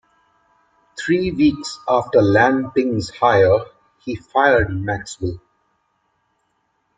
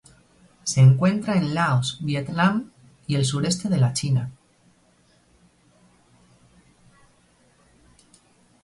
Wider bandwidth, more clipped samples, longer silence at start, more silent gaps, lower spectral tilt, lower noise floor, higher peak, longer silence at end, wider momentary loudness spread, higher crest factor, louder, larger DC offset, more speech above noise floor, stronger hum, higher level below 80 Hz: second, 9.4 kHz vs 11.5 kHz; neither; first, 0.95 s vs 0.65 s; neither; about the same, -6 dB/octave vs -5.5 dB/octave; first, -68 dBFS vs -60 dBFS; first, -2 dBFS vs -6 dBFS; second, 1.6 s vs 4.3 s; first, 16 LU vs 13 LU; about the same, 18 dB vs 18 dB; first, -18 LUFS vs -22 LUFS; neither; first, 51 dB vs 40 dB; neither; first, -44 dBFS vs -58 dBFS